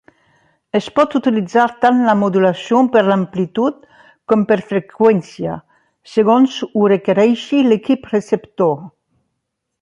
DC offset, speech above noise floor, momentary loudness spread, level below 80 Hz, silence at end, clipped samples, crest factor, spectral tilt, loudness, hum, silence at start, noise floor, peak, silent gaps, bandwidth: under 0.1%; 60 dB; 9 LU; -58 dBFS; 0.95 s; under 0.1%; 14 dB; -7 dB/octave; -15 LUFS; none; 0.75 s; -75 dBFS; -2 dBFS; none; 9 kHz